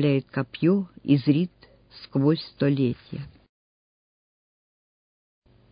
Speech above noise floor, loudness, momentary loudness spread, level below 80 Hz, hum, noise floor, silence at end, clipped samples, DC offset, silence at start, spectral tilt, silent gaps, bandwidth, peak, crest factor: over 66 dB; -25 LUFS; 17 LU; -62 dBFS; none; under -90 dBFS; 2.45 s; under 0.1%; under 0.1%; 0 s; -12 dB/octave; none; 5.2 kHz; -8 dBFS; 20 dB